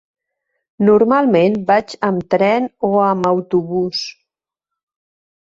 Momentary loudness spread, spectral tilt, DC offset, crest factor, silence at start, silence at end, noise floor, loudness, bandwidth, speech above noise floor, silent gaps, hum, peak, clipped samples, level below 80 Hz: 7 LU; -6.5 dB/octave; under 0.1%; 16 dB; 0.8 s; 1.45 s; -84 dBFS; -16 LUFS; 7.8 kHz; 69 dB; none; none; -2 dBFS; under 0.1%; -58 dBFS